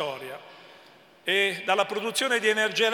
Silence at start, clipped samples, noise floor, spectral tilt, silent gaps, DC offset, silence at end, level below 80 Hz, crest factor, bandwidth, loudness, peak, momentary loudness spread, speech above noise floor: 0 s; under 0.1%; -54 dBFS; -2 dB/octave; none; under 0.1%; 0 s; -86 dBFS; 18 dB; 18 kHz; -25 LUFS; -8 dBFS; 15 LU; 28 dB